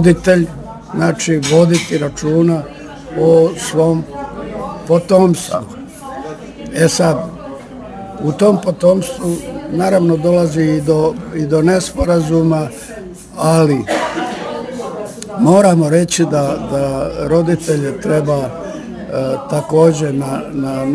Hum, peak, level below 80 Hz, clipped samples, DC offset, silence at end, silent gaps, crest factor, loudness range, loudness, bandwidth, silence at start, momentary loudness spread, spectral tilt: none; 0 dBFS; -38 dBFS; under 0.1%; under 0.1%; 0 s; none; 14 dB; 3 LU; -14 LUFS; 11 kHz; 0 s; 16 LU; -6 dB/octave